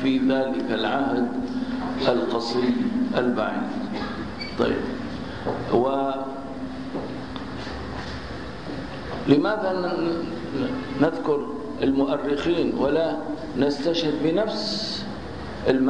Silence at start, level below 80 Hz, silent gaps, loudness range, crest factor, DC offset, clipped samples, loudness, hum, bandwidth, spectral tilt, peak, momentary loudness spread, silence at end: 0 s; -46 dBFS; none; 4 LU; 18 dB; 0.8%; under 0.1%; -25 LUFS; none; 10 kHz; -6.5 dB/octave; -6 dBFS; 11 LU; 0 s